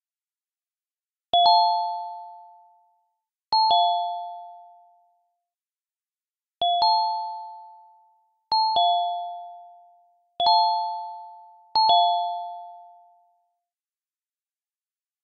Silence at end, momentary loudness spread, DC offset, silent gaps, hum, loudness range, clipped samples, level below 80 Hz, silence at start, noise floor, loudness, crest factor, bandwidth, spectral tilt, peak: 2.4 s; 22 LU; under 0.1%; none; none; 4 LU; under 0.1%; -72 dBFS; 1.35 s; under -90 dBFS; -22 LUFS; 20 dB; 5.4 kHz; -3.5 dB/octave; -6 dBFS